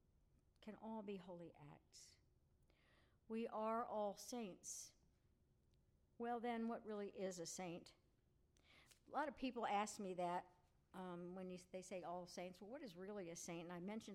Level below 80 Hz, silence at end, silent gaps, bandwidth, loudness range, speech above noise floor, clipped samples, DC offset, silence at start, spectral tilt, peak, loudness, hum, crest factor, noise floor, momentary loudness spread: -80 dBFS; 0 s; none; 16 kHz; 5 LU; 29 dB; under 0.1%; under 0.1%; 0.6 s; -4.5 dB/octave; -32 dBFS; -50 LUFS; none; 20 dB; -79 dBFS; 17 LU